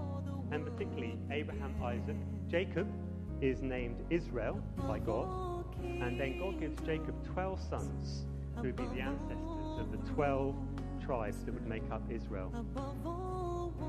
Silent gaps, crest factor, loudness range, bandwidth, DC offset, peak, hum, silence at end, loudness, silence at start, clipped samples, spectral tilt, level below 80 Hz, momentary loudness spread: none; 18 dB; 2 LU; 13 kHz; under 0.1%; -18 dBFS; none; 0 s; -39 LUFS; 0 s; under 0.1%; -7.5 dB/octave; -46 dBFS; 5 LU